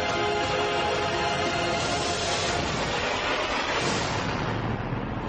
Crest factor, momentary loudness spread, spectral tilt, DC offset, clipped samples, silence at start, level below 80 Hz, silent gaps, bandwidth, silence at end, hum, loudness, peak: 12 dB; 3 LU; -3.5 dB/octave; under 0.1%; under 0.1%; 0 s; -44 dBFS; none; 9.4 kHz; 0 s; none; -26 LUFS; -14 dBFS